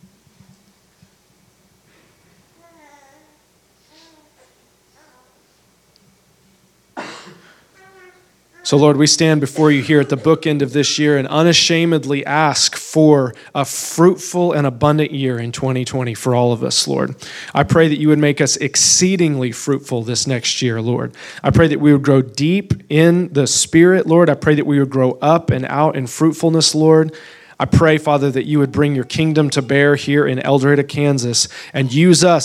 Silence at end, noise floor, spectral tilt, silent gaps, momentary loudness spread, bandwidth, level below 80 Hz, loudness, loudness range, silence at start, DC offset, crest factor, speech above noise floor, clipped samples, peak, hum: 0 s; -56 dBFS; -4.5 dB/octave; none; 9 LU; 15 kHz; -46 dBFS; -14 LUFS; 3 LU; 6.95 s; under 0.1%; 16 dB; 42 dB; under 0.1%; 0 dBFS; none